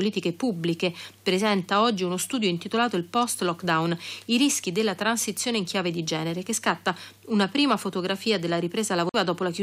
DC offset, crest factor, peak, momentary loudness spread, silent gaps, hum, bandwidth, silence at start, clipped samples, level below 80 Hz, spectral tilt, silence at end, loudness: under 0.1%; 16 dB; -10 dBFS; 6 LU; none; none; 16 kHz; 0 s; under 0.1%; -74 dBFS; -4 dB/octave; 0 s; -25 LUFS